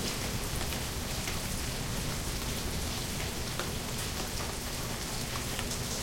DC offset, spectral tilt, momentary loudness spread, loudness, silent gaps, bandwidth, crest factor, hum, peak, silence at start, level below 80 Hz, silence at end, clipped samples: under 0.1%; -3 dB/octave; 1 LU; -34 LUFS; none; 16.5 kHz; 22 dB; none; -14 dBFS; 0 s; -42 dBFS; 0 s; under 0.1%